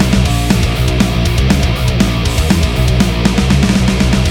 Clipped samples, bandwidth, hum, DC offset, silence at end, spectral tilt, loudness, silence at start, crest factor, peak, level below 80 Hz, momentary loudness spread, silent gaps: under 0.1%; 17.5 kHz; none; under 0.1%; 0 s; -5.5 dB/octave; -13 LUFS; 0 s; 12 dB; 0 dBFS; -16 dBFS; 2 LU; none